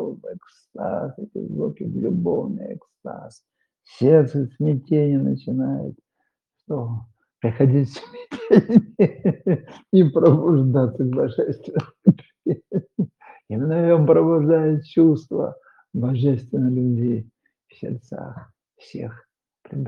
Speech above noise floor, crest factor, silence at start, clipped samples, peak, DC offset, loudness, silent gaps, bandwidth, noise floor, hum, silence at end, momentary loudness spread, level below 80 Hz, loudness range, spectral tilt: 56 dB; 20 dB; 0 s; under 0.1%; 0 dBFS; under 0.1%; -20 LUFS; none; 6.8 kHz; -76 dBFS; none; 0 s; 19 LU; -64 dBFS; 8 LU; -10.5 dB/octave